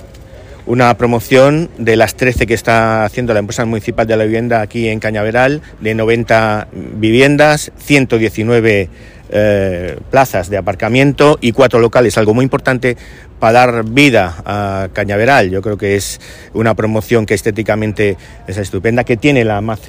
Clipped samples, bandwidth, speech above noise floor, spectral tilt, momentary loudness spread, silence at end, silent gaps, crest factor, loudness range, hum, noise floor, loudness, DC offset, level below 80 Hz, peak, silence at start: under 0.1%; 16 kHz; 22 dB; -6 dB/octave; 9 LU; 0 s; none; 12 dB; 3 LU; none; -34 dBFS; -12 LUFS; under 0.1%; -34 dBFS; 0 dBFS; 0 s